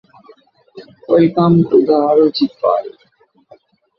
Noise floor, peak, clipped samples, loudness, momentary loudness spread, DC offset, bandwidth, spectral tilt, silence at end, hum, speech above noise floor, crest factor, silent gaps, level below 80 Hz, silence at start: -55 dBFS; -2 dBFS; under 0.1%; -13 LUFS; 8 LU; under 0.1%; 5.8 kHz; -10 dB/octave; 1.1 s; none; 43 dB; 14 dB; none; -56 dBFS; 0.75 s